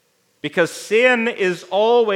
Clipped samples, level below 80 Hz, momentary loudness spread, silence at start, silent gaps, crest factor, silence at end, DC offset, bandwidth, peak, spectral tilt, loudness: under 0.1%; -78 dBFS; 8 LU; 0.45 s; none; 16 dB; 0 s; under 0.1%; 15.5 kHz; -2 dBFS; -4 dB/octave; -18 LUFS